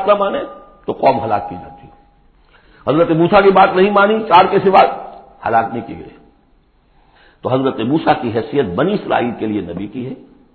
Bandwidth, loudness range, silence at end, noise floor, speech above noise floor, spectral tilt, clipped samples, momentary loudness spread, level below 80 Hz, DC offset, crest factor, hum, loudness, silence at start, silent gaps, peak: 4.6 kHz; 8 LU; 0.35 s; -53 dBFS; 39 dB; -9 dB/octave; under 0.1%; 19 LU; -48 dBFS; under 0.1%; 16 dB; none; -14 LUFS; 0 s; none; 0 dBFS